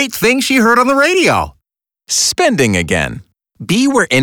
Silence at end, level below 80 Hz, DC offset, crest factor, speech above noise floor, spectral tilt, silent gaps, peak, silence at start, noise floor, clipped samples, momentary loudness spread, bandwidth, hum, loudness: 0 s; -42 dBFS; under 0.1%; 12 dB; 61 dB; -3.5 dB/octave; none; -2 dBFS; 0 s; -73 dBFS; under 0.1%; 10 LU; over 20 kHz; none; -12 LUFS